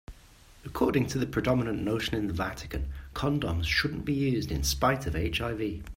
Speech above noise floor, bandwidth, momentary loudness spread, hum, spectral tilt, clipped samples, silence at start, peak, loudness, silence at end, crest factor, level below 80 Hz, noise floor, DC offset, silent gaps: 26 dB; 16 kHz; 9 LU; none; -5 dB/octave; under 0.1%; 0.1 s; -12 dBFS; -29 LUFS; 0 s; 18 dB; -42 dBFS; -54 dBFS; under 0.1%; none